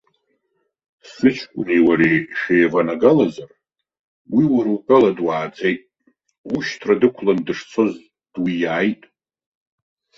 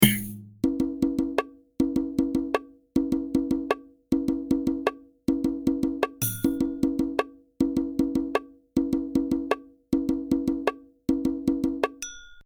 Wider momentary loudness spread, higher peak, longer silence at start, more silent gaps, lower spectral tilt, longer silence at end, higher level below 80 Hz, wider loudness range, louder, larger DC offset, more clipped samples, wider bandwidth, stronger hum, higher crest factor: first, 11 LU vs 5 LU; about the same, -2 dBFS vs -2 dBFS; first, 1.05 s vs 0 s; first, 3.99-4.25 s, 6.38-6.44 s vs none; first, -7 dB/octave vs -5 dB/octave; first, 1.25 s vs 0.05 s; second, -60 dBFS vs -48 dBFS; first, 4 LU vs 1 LU; first, -18 LUFS vs -27 LUFS; neither; neither; second, 7.4 kHz vs over 20 kHz; neither; second, 18 dB vs 24 dB